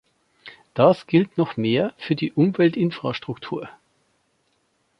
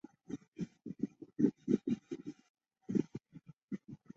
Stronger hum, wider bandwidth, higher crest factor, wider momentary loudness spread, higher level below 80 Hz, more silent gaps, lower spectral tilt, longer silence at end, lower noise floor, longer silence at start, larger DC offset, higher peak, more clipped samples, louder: neither; second, 6.2 kHz vs 7.6 kHz; about the same, 20 dB vs 24 dB; second, 14 LU vs 17 LU; first, -64 dBFS vs -74 dBFS; second, none vs 0.48-0.52 s, 2.49-2.54 s, 3.63-3.68 s; about the same, -8.5 dB/octave vs -9.5 dB/octave; first, 1.3 s vs 0.2 s; first, -68 dBFS vs -59 dBFS; first, 0.45 s vs 0.3 s; neither; first, -2 dBFS vs -16 dBFS; neither; first, -22 LUFS vs -39 LUFS